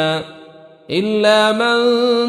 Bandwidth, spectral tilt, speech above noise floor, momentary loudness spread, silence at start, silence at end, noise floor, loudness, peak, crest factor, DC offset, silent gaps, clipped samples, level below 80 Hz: 13 kHz; -4.5 dB/octave; 26 dB; 11 LU; 0 s; 0 s; -41 dBFS; -15 LUFS; -2 dBFS; 14 dB; under 0.1%; none; under 0.1%; -60 dBFS